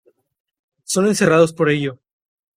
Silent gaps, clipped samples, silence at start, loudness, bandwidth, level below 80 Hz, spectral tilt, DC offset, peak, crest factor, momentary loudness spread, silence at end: none; under 0.1%; 0.9 s; -17 LUFS; 16 kHz; -58 dBFS; -5 dB/octave; under 0.1%; -2 dBFS; 18 dB; 8 LU; 0.65 s